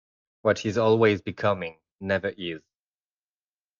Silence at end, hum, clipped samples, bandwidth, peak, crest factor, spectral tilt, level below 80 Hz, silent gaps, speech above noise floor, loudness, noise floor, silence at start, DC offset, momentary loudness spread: 1.2 s; none; under 0.1%; 7.4 kHz; -8 dBFS; 20 dB; -6 dB/octave; -66 dBFS; 1.91-1.99 s; over 66 dB; -25 LUFS; under -90 dBFS; 0.45 s; under 0.1%; 16 LU